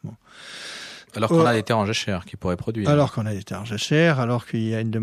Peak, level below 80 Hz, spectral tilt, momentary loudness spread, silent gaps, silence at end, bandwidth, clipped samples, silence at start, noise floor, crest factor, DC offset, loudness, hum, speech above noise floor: -6 dBFS; -54 dBFS; -6 dB/octave; 17 LU; none; 0 s; 14 kHz; under 0.1%; 0.05 s; -42 dBFS; 18 dB; under 0.1%; -22 LUFS; none; 20 dB